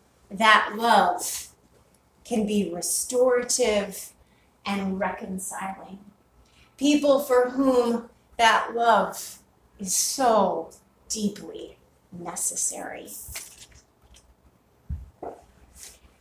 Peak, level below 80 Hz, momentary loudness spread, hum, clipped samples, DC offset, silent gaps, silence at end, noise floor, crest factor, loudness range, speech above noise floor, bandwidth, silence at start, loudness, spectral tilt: -2 dBFS; -52 dBFS; 21 LU; none; under 0.1%; under 0.1%; none; 0.3 s; -60 dBFS; 24 dB; 10 LU; 37 dB; 16 kHz; 0.3 s; -23 LUFS; -3 dB/octave